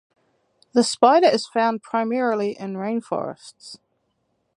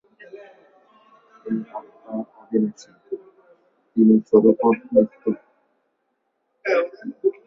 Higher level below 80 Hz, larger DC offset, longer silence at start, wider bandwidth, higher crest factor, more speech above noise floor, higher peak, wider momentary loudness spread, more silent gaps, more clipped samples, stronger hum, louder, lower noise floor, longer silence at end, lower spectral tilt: second, -74 dBFS vs -66 dBFS; neither; first, 0.75 s vs 0.35 s; first, 11.5 kHz vs 7 kHz; about the same, 22 dB vs 20 dB; about the same, 50 dB vs 53 dB; about the same, 0 dBFS vs -2 dBFS; first, 23 LU vs 20 LU; neither; neither; neither; about the same, -21 LUFS vs -21 LUFS; about the same, -71 dBFS vs -73 dBFS; first, 0.8 s vs 0.15 s; second, -4 dB/octave vs -8.5 dB/octave